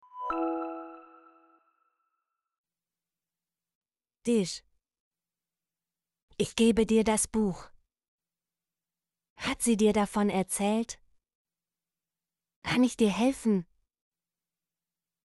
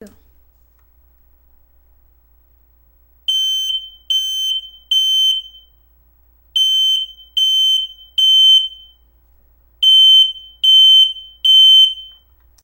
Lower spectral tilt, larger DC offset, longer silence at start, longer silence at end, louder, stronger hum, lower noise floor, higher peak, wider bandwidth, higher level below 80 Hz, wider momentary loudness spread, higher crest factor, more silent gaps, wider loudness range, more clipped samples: first, -4.5 dB/octave vs 2.5 dB/octave; neither; first, 0.15 s vs 0 s; first, 1.6 s vs 0.55 s; second, -28 LUFS vs -10 LUFS; neither; first, under -90 dBFS vs -53 dBFS; second, -12 dBFS vs -4 dBFS; second, 11.5 kHz vs 16 kHz; about the same, -58 dBFS vs -54 dBFS; about the same, 15 LU vs 15 LU; first, 20 dB vs 12 dB; first, 2.58-2.64 s, 3.75-3.81 s, 5.00-5.11 s, 6.22-6.28 s, 8.08-8.19 s, 9.30-9.36 s, 11.35-11.45 s, 12.56-12.62 s vs none; second, 7 LU vs 12 LU; neither